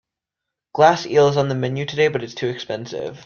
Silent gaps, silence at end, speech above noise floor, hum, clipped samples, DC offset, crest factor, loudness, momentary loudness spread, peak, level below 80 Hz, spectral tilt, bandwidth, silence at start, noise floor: none; 0 s; 65 dB; none; under 0.1%; under 0.1%; 18 dB; -19 LUFS; 12 LU; -2 dBFS; -60 dBFS; -5.5 dB/octave; 7 kHz; 0.75 s; -84 dBFS